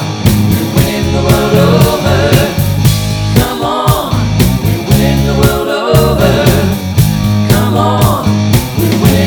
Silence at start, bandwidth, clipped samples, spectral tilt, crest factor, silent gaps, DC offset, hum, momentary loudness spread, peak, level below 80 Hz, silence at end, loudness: 0 s; over 20 kHz; 0.5%; -6 dB/octave; 10 dB; none; 0.2%; none; 4 LU; 0 dBFS; -22 dBFS; 0 s; -10 LUFS